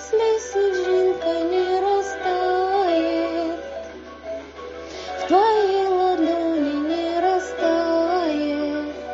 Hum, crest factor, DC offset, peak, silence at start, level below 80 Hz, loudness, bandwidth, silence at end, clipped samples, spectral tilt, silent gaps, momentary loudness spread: none; 16 dB; under 0.1%; -6 dBFS; 0 s; -52 dBFS; -21 LUFS; 7.8 kHz; 0 s; under 0.1%; -2.5 dB/octave; none; 14 LU